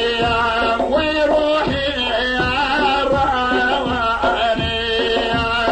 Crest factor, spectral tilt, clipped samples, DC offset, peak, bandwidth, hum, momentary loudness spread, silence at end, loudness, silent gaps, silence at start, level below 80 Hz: 12 dB; -5 dB/octave; under 0.1%; under 0.1%; -6 dBFS; 9.2 kHz; none; 2 LU; 0 s; -17 LUFS; none; 0 s; -34 dBFS